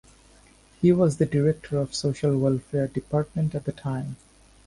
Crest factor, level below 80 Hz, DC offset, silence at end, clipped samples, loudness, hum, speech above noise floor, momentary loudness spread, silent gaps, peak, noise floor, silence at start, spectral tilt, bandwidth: 18 dB; -52 dBFS; under 0.1%; 0.5 s; under 0.1%; -25 LUFS; none; 31 dB; 10 LU; none; -8 dBFS; -55 dBFS; 0.8 s; -7.5 dB/octave; 11.5 kHz